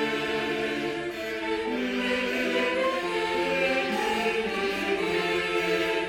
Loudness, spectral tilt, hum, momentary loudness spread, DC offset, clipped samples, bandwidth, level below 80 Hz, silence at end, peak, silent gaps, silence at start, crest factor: -27 LUFS; -4 dB/octave; none; 4 LU; under 0.1%; under 0.1%; 17 kHz; -56 dBFS; 0 s; -12 dBFS; none; 0 s; 14 dB